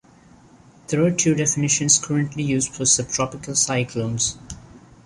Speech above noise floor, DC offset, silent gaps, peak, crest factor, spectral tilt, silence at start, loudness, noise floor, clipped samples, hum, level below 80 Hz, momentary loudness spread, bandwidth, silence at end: 29 dB; under 0.1%; none; -2 dBFS; 20 dB; -3.5 dB/octave; 0.9 s; -20 LUFS; -50 dBFS; under 0.1%; none; -50 dBFS; 9 LU; 11.5 kHz; 0.25 s